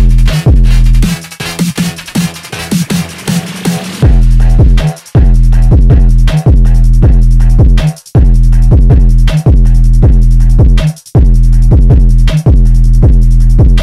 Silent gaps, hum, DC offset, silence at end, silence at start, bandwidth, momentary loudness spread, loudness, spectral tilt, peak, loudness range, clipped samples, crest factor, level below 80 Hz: none; none; under 0.1%; 0 s; 0 s; 13.5 kHz; 7 LU; -9 LUFS; -6.5 dB/octave; 0 dBFS; 4 LU; under 0.1%; 4 dB; -6 dBFS